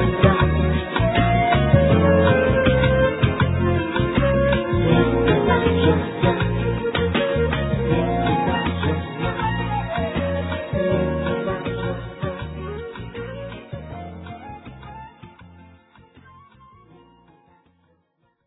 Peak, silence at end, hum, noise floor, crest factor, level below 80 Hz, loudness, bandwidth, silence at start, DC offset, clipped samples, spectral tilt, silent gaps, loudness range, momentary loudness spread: 0 dBFS; 3 s; none; -67 dBFS; 20 dB; -32 dBFS; -20 LUFS; 4 kHz; 0 s; under 0.1%; under 0.1%; -11 dB/octave; none; 18 LU; 17 LU